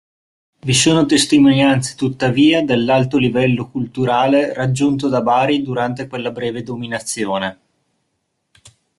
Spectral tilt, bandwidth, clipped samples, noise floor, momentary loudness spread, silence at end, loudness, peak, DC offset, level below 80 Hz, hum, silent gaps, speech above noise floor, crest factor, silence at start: -5 dB/octave; 12.5 kHz; under 0.1%; -70 dBFS; 12 LU; 1.45 s; -16 LUFS; -2 dBFS; under 0.1%; -52 dBFS; none; none; 55 dB; 16 dB; 0.65 s